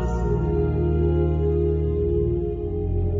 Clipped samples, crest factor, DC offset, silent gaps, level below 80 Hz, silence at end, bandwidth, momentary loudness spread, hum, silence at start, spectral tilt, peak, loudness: under 0.1%; 12 dB; under 0.1%; none; -26 dBFS; 0 s; 7 kHz; 5 LU; none; 0 s; -10.5 dB/octave; -10 dBFS; -23 LUFS